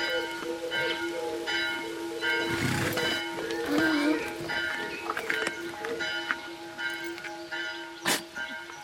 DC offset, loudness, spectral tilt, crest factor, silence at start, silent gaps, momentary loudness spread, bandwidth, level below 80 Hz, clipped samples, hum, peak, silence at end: under 0.1%; -30 LUFS; -3.5 dB/octave; 22 dB; 0 s; none; 9 LU; 16.5 kHz; -64 dBFS; under 0.1%; none; -10 dBFS; 0 s